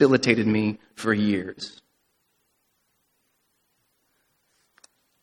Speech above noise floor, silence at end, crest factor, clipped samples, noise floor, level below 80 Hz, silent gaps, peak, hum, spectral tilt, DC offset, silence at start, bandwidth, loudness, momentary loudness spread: 49 dB; 3.55 s; 24 dB; under 0.1%; -72 dBFS; -64 dBFS; none; -2 dBFS; none; -6 dB/octave; under 0.1%; 0 s; 12 kHz; -24 LUFS; 17 LU